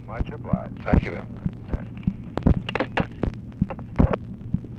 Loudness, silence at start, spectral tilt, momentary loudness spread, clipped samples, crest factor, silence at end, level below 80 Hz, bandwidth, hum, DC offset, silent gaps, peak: -27 LUFS; 0 s; -9 dB/octave; 9 LU; under 0.1%; 18 dB; 0 s; -32 dBFS; 7.4 kHz; none; under 0.1%; none; -6 dBFS